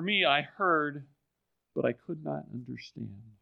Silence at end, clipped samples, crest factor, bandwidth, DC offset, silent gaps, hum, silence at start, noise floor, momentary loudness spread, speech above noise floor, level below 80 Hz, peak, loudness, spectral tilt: 0.1 s; under 0.1%; 22 dB; 6.8 kHz; under 0.1%; none; none; 0 s; -82 dBFS; 18 LU; 51 dB; -76 dBFS; -10 dBFS; -30 LUFS; -6.5 dB/octave